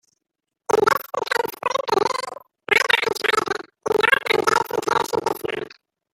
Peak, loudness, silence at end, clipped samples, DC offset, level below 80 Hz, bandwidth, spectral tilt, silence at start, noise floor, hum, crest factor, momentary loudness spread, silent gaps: -2 dBFS; -21 LUFS; 0.45 s; under 0.1%; under 0.1%; -62 dBFS; 17 kHz; -2.5 dB/octave; 0.7 s; -82 dBFS; none; 20 dB; 12 LU; none